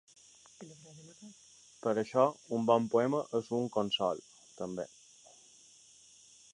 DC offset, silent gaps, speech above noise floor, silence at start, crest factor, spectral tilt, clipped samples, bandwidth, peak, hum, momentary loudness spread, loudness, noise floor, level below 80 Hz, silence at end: under 0.1%; none; 28 dB; 0.6 s; 22 dB; -5 dB/octave; under 0.1%; 11 kHz; -14 dBFS; none; 24 LU; -33 LUFS; -60 dBFS; -76 dBFS; 1.65 s